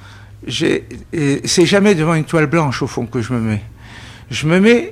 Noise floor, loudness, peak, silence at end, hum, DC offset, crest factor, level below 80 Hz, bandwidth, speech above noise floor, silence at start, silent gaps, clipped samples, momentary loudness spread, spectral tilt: -36 dBFS; -16 LUFS; 0 dBFS; 0 s; none; under 0.1%; 14 dB; -42 dBFS; 15 kHz; 21 dB; 0 s; none; under 0.1%; 19 LU; -5 dB/octave